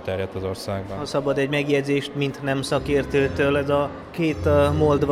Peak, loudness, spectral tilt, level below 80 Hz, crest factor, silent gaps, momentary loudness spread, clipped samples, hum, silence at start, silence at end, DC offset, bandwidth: -8 dBFS; -23 LUFS; -6.5 dB/octave; -42 dBFS; 14 dB; none; 9 LU; under 0.1%; none; 0 s; 0 s; under 0.1%; 14.5 kHz